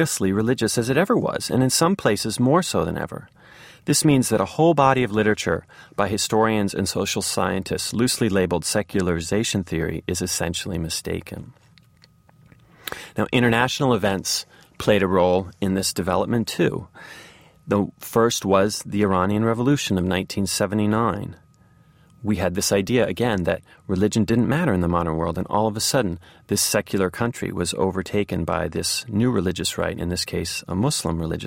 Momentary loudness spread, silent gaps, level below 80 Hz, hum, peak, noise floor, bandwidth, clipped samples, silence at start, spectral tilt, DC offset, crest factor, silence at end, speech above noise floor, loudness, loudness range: 8 LU; none; -48 dBFS; none; -2 dBFS; -55 dBFS; 16.5 kHz; under 0.1%; 0 s; -4.5 dB/octave; under 0.1%; 20 dB; 0 s; 33 dB; -22 LUFS; 4 LU